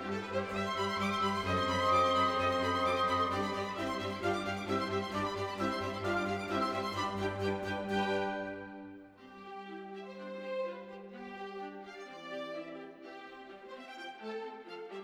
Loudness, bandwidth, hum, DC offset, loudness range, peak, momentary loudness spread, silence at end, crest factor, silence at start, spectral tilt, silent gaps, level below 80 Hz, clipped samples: -34 LUFS; 16.5 kHz; none; under 0.1%; 14 LU; -18 dBFS; 18 LU; 0 s; 18 dB; 0 s; -5 dB/octave; none; -66 dBFS; under 0.1%